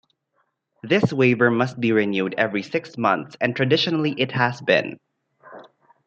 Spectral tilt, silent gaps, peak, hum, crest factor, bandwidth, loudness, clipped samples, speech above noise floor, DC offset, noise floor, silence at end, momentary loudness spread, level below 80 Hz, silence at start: -6.5 dB/octave; none; -2 dBFS; none; 20 dB; 8 kHz; -21 LUFS; under 0.1%; 50 dB; under 0.1%; -71 dBFS; 0.45 s; 7 LU; -68 dBFS; 0.85 s